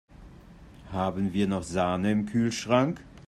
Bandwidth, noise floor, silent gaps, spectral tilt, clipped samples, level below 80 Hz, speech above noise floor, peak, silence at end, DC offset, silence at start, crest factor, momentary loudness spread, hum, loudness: 12.5 kHz; -49 dBFS; none; -6 dB/octave; under 0.1%; -54 dBFS; 23 dB; -10 dBFS; 0.05 s; under 0.1%; 0.2 s; 18 dB; 6 LU; none; -27 LUFS